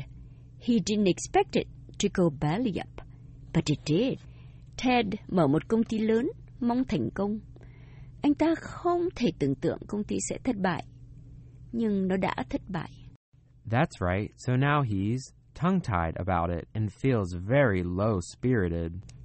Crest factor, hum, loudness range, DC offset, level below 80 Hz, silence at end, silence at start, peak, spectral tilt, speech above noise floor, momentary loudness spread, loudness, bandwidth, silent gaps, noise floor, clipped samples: 18 dB; none; 3 LU; under 0.1%; -50 dBFS; 0 s; 0 s; -12 dBFS; -6.5 dB/octave; 20 dB; 12 LU; -28 LUFS; 8.4 kHz; 13.16-13.32 s; -48 dBFS; under 0.1%